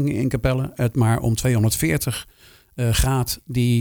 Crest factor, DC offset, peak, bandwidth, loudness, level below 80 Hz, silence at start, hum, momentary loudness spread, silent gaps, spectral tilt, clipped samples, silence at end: 16 dB; under 0.1%; -6 dBFS; over 20 kHz; -21 LUFS; -34 dBFS; 0 s; none; 6 LU; none; -5.5 dB/octave; under 0.1%; 0 s